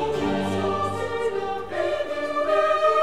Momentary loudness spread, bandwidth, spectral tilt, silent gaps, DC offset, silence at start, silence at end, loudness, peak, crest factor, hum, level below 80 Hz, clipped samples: 7 LU; 13 kHz; -5.5 dB/octave; none; 0.8%; 0 s; 0 s; -24 LUFS; -10 dBFS; 14 dB; none; -52 dBFS; under 0.1%